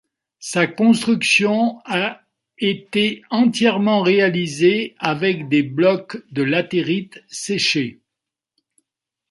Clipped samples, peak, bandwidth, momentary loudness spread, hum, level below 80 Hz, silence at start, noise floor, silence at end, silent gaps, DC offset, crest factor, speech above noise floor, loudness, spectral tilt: under 0.1%; -2 dBFS; 11.5 kHz; 10 LU; none; -64 dBFS; 0.4 s; -85 dBFS; 1.35 s; none; under 0.1%; 18 dB; 66 dB; -18 LUFS; -4.5 dB/octave